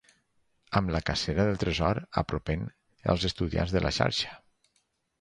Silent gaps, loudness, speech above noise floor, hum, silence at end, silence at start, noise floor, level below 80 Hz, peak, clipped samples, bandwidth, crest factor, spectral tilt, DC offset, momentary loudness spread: none; -29 LUFS; 46 dB; none; 0.85 s; 0.7 s; -74 dBFS; -42 dBFS; -8 dBFS; under 0.1%; 11 kHz; 22 dB; -5.5 dB/octave; under 0.1%; 7 LU